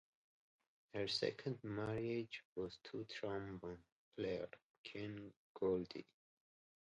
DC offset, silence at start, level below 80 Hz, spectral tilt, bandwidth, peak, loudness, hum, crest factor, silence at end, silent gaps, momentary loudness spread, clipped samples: under 0.1%; 0.95 s; -72 dBFS; -6 dB/octave; 9.4 kHz; -26 dBFS; -46 LUFS; none; 22 dB; 0.85 s; 2.45-2.56 s, 3.92-4.12 s, 4.62-4.84 s, 5.36-5.55 s; 14 LU; under 0.1%